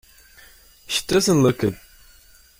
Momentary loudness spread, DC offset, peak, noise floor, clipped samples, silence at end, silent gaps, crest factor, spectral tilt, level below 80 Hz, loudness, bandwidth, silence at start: 9 LU; under 0.1%; -6 dBFS; -51 dBFS; under 0.1%; 0.85 s; none; 18 dB; -4.5 dB/octave; -50 dBFS; -20 LUFS; 16.5 kHz; 0.9 s